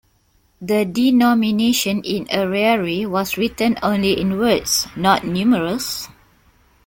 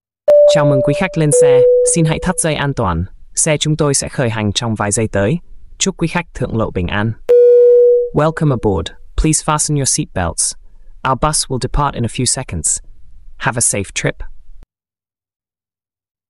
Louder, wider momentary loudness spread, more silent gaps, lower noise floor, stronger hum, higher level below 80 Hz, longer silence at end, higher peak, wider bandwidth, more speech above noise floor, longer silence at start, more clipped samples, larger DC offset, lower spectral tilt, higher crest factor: second, -18 LUFS vs -14 LUFS; second, 7 LU vs 10 LU; neither; second, -59 dBFS vs under -90 dBFS; neither; second, -48 dBFS vs -30 dBFS; second, 0.8 s vs 1.7 s; about the same, -2 dBFS vs -2 dBFS; first, 17 kHz vs 12 kHz; second, 42 dB vs over 75 dB; first, 0.6 s vs 0.25 s; neither; neither; about the same, -4 dB/octave vs -4.5 dB/octave; first, 18 dB vs 12 dB